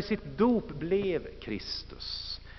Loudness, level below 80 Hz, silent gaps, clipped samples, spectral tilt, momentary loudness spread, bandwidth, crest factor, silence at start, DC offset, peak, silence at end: -32 LUFS; -50 dBFS; none; under 0.1%; -4.5 dB/octave; 10 LU; 6.2 kHz; 18 dB; 0 s; under 0.1%; -14 dBFS; 0 s